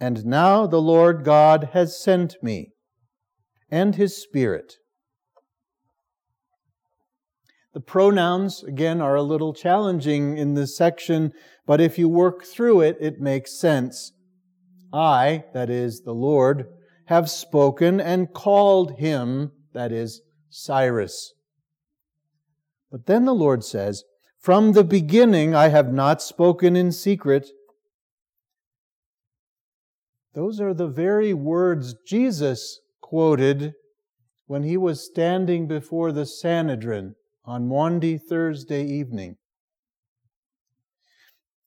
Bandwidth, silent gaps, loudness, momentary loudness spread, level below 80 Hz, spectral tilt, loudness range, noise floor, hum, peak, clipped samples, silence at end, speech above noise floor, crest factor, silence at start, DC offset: 17 kHz; 27.94-28.26 s, 28.67-28.71 s, 28.78-29.18 s, 29.39-30.13 s; -20 LUFS; 14 LU; -76 dBFS; -7 dB/octave; 10 LU; -83 dBFS; none; -4 dBFS; under 0.1%; 2.35 s; 63 dB; 18 dB; 0 s; under 0.1%